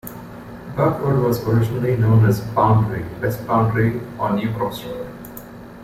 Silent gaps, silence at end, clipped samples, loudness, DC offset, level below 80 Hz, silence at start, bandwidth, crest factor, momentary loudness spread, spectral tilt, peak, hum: none; 0 s; under 0.1%; -19 LUFS; under 0.1%; -44 dBFS; 0.05 s; 16 kHz; 16 dB; 20 LU; -8 dB/octave; -4 dBFS; none